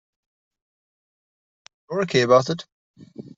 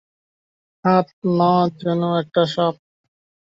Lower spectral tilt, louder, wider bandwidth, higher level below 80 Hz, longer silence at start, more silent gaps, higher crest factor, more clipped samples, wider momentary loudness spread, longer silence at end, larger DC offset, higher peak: second, -5 dB/octave vs -8 dB/octave; about the same, -21 LUFS vs -19 LUFS; about the same, 8 kHz vs 7.6 kHz; about the same, -66 dBFS vs -62 dBFS; first, 1.9 s vs 0.85 s; first, 2.72-2.94 s vs 1.13-1.22 s; about the same, 22 dB vs 18 dB; neither; first, 15 LU vs 5 LU; second, 0.15 s vs 0.8 s; neither; about the same, -4 dBFS vs -4 dBFS